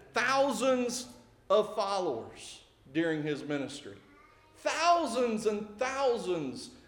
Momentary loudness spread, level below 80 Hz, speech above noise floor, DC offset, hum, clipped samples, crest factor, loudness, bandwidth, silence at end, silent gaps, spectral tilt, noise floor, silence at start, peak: 18 LU; -68 dBFS; 28 dB; under 0.1%; none; under 0.1%; 18 dB; -31 LUFS; 18 kHz; 0.1 s; none; -4 dB/octave; -59 dBFS; 0 s; -14 dBFS